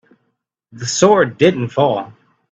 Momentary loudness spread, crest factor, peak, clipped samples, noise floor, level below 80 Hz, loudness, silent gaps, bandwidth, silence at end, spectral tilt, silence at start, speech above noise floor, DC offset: 13 LU; 16 dB; 0 dBFS; under 0.1%; -70 dBFS; -58 dBFS; -15 LUFS; none; 9 kHz; 0.45 s; -4.5 dB/octave; 0.75 s; 56 dB; under 0.1%